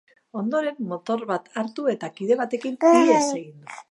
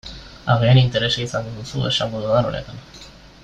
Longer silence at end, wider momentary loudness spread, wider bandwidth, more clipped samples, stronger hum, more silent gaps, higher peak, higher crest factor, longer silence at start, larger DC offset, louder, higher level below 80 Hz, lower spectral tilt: about the same, 0.1 s vs 0.15 s; second, 15 LU vs 22 LU; first, 11.5 kHz vs 8.8 kHz; neither; neither; neither; about the same, -4 dBFS vs -2 dBFS; about the same, 20 dB vs 18 dB; first, 0.35 s vs 0.05 s; neither; second, -23 LUFS vs -19 LUFS; second, -82 dBFS vs -44 dBFS; about the same, -5 dB/octave vs -6 dB/octave